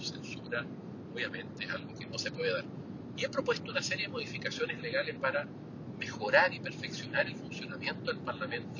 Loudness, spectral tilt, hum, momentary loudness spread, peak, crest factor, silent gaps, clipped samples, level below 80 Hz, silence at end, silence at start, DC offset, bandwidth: -35 LUFS; -4 dB/octave; none; 11 LU; -10 dBFS; 26 dB; none; under 0.1%; -68 dBFS; 0 s; 0 s; under 0.1%; 7.4 kHz